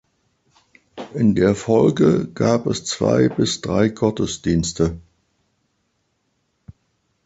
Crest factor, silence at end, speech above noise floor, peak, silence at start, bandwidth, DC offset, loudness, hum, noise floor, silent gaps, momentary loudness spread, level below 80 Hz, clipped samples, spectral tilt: 18 dB; 2.25 s; 51 dB; -2 dBFS; 0.95 s; 8.2 kHz; under 0.1%; -19 LUFS; none; -69 dBFS; none; 7 LU; -44 dBFS; under 0.1%; -6 dB/octave